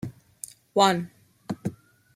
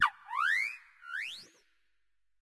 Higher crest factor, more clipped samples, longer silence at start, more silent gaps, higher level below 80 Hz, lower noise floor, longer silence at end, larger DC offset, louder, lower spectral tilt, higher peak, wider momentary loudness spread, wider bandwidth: about the same, 24 dB vs 22 dB; neither; about the same, 0.05 s vs 0 s; neither; first, -66 dBFS vs -80 dBFS; second, -46 dBFS vs -85 dBFS; second, 0.4 s vs 1 s; neither; first, -25 LUFS vs -33 LUFS; first, -4.5 dB/octave vs 1.5 dB/octave; first, -4 dBFS vs -14 dBFS; first, 20 LU vs 16 LU; first, 16 kHz vs 12 kHz